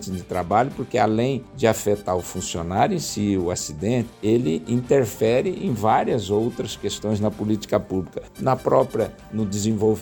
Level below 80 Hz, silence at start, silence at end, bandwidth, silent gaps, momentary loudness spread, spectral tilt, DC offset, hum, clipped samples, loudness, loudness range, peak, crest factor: -50 dBFS; 0 s; 0 s; 18 kHz; none; 7 LU; -5.5 dB/octave; under 0.1%; none; under 0.1%; -23 LUFS; 2 LU; -4 dBFS; 18 dB